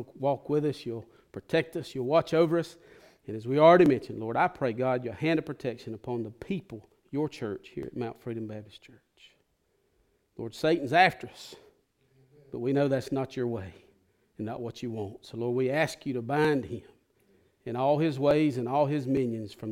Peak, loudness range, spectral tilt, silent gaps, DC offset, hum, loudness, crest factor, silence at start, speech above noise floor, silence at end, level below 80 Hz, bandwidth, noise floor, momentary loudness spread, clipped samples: -8 dBFS; 11 LU; -7 dB/octave; none; under 0.1%; none; -28 LUFS; 22 dB; 0 s; 44 dB; 0 s; -66 dBFS; 16 kHz; -73 dBFS; 17 LU; under 0.1%